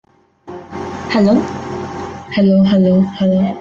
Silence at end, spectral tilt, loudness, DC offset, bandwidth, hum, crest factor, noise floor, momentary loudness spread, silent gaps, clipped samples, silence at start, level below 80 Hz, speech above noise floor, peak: 0 s; -8 dB/octave; -14 LUFS; under 0.1%; 7.2 kHz; none; 12 dB; -38 dBFS; 16 LU; none; under 0.1%; 0.45 s; -50 dBFS; 26 dB; -2 dBFS